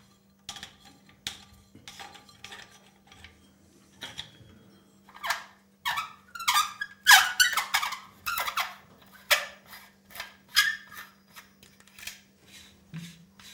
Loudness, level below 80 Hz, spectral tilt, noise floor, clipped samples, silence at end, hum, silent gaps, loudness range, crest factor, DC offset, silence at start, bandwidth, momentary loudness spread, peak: -25 LUFS; -68 dBFS; 1 dB/octave; -59 dBFS; under 0.1%; 0 s; none; none; 22 LU; 30 dB; under 0.1%; 0.5 s; 18 kHz; 24 LU; -2 dBFS